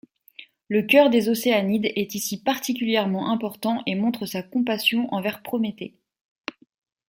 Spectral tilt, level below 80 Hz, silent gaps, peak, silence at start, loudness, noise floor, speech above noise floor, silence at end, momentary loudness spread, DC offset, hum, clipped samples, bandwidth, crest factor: -4.5 dB/octave; -70 dBFS; none; -4 dBFS; 0.4 s; -23 LUFS; -49 dBFS; 26 dB; 1.2 s; 13 LU; under 0.1%; none; under 0.1%; 17 kHz; 20 dB